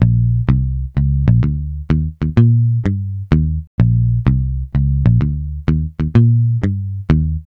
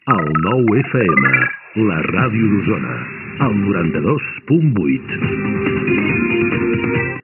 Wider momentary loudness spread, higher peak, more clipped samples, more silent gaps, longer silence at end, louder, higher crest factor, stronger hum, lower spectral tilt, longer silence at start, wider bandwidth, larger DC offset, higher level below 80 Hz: about the same, 7 LU vs 6 LU; about the same, 0 dBFS vs 0 dBFS; neither; first, 3.67-3.78 s vs none; about the same, 0.1 s vs 0.05 s; about the same, -16 LUFS vs -16 LUFS; about the same, 14 dB vs 16 dB; neither; about the same, -10.5 dB/octave vs -11.5 dB/octave; about the same, 0 s vs 0.05 s; first, 4.3 kHz vs 3.5 kHz; neither; first, -22 dBFS vs -44 dBFS